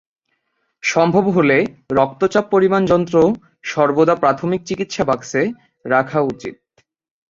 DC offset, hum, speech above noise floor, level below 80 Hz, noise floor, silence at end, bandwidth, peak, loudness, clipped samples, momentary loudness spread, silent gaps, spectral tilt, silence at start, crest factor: under 0.1%; none; 53 dB; -54 dBFS; -69 dBFS; 0.75 s; 7.6 kHz; -2 dBFS; -17 LUFS; under 0.1%; 9 LU; none; -6 dB/octave; 0.85 s; 16 dB